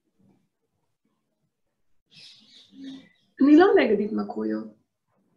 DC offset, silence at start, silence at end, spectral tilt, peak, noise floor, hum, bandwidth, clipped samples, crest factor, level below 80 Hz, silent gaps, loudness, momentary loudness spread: under 0.1%; 2.8 s; 0.65 s; -7 dB/octave; -6 dBFS; -77 dBFS; none; 6.6 kHz; under 0.1%; 20 dB; -68 dBFS; none; -21 LUFS; 26 LU